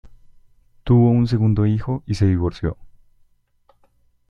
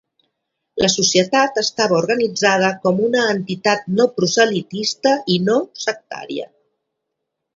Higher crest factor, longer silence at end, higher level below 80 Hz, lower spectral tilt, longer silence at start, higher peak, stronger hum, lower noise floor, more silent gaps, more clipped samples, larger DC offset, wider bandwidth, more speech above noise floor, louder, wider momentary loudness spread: about the same, 16 dB vs 18 dB; first, 1.4 s vs 1.1 s; first, -40 dBFS vs -60 dBFS; first, -9 dB/octave vs -3.5 dB/octave; second, 0.05 s vs 0.75 s; second, -4 dBFS vs 0 dBFS; neither; second, -59 dBFS vs -78 dBFS; neither; neither; neither; about the same, 7.2 kHz vs 7.8 kHz; second, 42 dB vs 60 dB; about the same, -19 LUFS vs -17 LUFS; about the same, 13 LU vs 13 LU